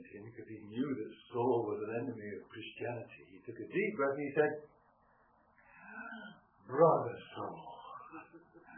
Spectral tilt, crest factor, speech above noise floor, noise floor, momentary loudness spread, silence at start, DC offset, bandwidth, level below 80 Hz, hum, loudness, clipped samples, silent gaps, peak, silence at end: -3 dB/octave; 24 dB; 34 dB; -69 dBFS; 20 LU; 0 s; under 0.1%; 3.3 kHz; -80 dBFS; none; -36 LUFS; under 0.1%; none; -16 dBFS; 0 s